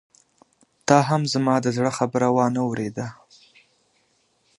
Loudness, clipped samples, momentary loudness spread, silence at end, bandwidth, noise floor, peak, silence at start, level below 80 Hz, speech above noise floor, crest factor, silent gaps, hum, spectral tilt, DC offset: -22 LUFS; under 0.1%; 12 LU; 1.45 s; 11.5 kHz; -66 dBFS; 0 dBFS; 0.9 s; -64 dBFS; 45 dB; 24 dB; none; none; -5.5 dB/octave; under 0.1%